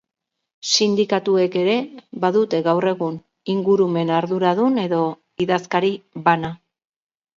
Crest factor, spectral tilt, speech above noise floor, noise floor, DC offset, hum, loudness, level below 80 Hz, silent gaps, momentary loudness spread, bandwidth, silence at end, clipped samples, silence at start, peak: 18 dB; -5 dB/octave; 61 dB; -80 dBFS; under 0.1%; none; -20 LUFS; -64 dBFS; none; 8 LU; 7.8 kHz; 0.85 s; under 0.1%; 0.65 s; -2 dBFS